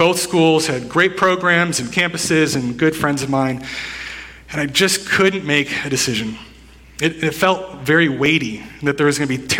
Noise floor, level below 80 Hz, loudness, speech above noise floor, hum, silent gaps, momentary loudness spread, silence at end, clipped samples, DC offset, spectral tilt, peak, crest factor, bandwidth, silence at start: -43 dBFS; -48 dBFS; -17 LUFS; 25 dB; none; none; 12 LU; 0 s; under 0.1%; under 0.1%; -4 dB/octave; 0 dBFS; 18 dB; 17.5 kHz; 0 s